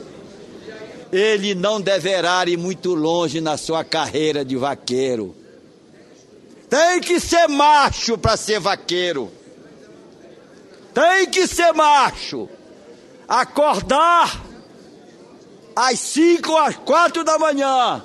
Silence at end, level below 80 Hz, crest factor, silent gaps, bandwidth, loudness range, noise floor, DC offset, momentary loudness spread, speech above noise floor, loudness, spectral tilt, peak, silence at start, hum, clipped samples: 0 s; -46 dBFS; 16 dB; none; 12.5 kHz; 5 LU; -47 dBFS; under 0.1%; 13 LU; 30 dB; -17 LUFS; -3.5 dB/octave; -2 dBFS; 0 s; none; under 0.1%